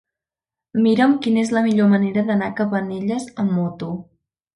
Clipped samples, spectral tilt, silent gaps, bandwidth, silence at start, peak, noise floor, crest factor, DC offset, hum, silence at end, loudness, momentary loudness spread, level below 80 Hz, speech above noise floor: under 0.1%; -7 dB/octave; none; 11 kHz; 0.75 s; -4 dBFS; -89 dBFS; 16 dB; under 0.1%; none; 0.55 s; -19 LUFS; 10 LU; -60 dBFS; 71 dB